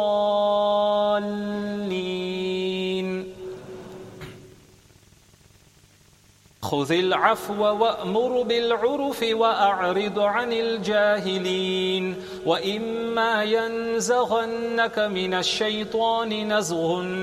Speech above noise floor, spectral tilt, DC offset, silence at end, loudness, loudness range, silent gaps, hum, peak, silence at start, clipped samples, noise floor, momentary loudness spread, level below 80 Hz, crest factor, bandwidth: 33 dB; -4 dB/octave; under 0.1%; 0 s; -23 LUFS; 10 LU; none; none; -4 dBFS; 0 s; under 0.1%; -56 dBFS; 9 LU; -62 dBFS; 20 dB; 15 kHz